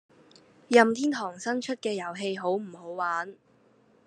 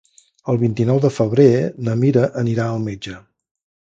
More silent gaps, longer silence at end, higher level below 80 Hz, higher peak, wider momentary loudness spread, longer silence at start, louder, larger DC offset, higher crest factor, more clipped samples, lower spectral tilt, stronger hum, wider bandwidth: neither; about the same, 0.7 s vs 0.7 s; second, -82 dBFS vs -54 dBFS; second, -4 dBFS vs 0 dBFS; about the same, 12 LU vs 13 LU; first, 0.7 s vs 0.45 s; second, -27 LUFS vs -18 LUFS; neither; first, 24 dB vs 18 dB; neither; second, -4 dB/octave vs -8 dB/octave; neither; first, 11 kHz vs 7.8 kHz